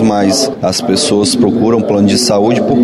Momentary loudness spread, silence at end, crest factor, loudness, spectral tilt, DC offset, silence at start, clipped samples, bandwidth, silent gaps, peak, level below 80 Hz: 3 LU; 0 s; 8 dB; -11 LUFS; -4.5 dB/octave; 0.1%; 0 s; under 0.1%; 13 kHz; none; -2 dBFS; -44 dBFS